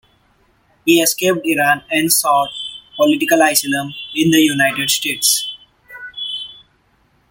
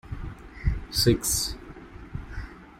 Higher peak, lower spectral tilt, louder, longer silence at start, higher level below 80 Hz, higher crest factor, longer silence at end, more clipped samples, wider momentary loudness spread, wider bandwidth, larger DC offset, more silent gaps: first, 0 dBFS vs -8 dBFS; second, -2.5 dB/octave vs -4 dB/octave; first, -15 LUFS vs -25 LUFS; first, 0.85 s vs 0.05 s; second, -58 dBFS vs -36 dBFS; about the same, 18 dB vs 22 dB; first, 0.75 s vs 0 s; neither; second, 15 LU vs 20 LU; about the same, 17 kHz vs 16.5 kHz; neither; neither